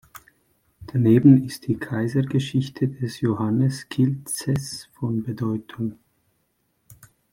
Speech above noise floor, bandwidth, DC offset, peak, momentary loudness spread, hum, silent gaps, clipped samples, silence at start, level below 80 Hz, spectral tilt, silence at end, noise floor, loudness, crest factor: 49 dB; 16.5 kHz; under 0.1%; -2 dBFS; 13 LU; none; none; under 0.1%; 0.8 s; -58 dBFS; -7 dB/octave; 0.4 s; -70 dBFS; -23 LUFS; 20 dB